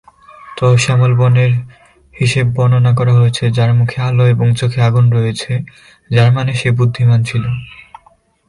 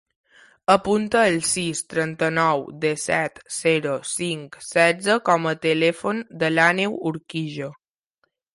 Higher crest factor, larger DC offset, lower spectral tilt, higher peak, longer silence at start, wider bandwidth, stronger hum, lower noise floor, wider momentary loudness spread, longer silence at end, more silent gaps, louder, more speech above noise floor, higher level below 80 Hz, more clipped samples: second, 12 dB vs 20 dB; neither; first, -6.5 dB/octave vs -4 dB/octave; about the same, 0 dBFS vs -2 dBFS; second, 0.45 s vs 0.7 s; about the same, 11 kHz vs 11.5 kHz; neither; second, -51 dBFS vs -72 dBFS; about the same, 9 LU vs 10 LU; about the same, 0.8 s vs 0.8 s; neither; first, -13 LUFS vs -21 LUFS; second, 39 dB vs 50 dB; first, -44 dBFS vs -60 dBFS; neither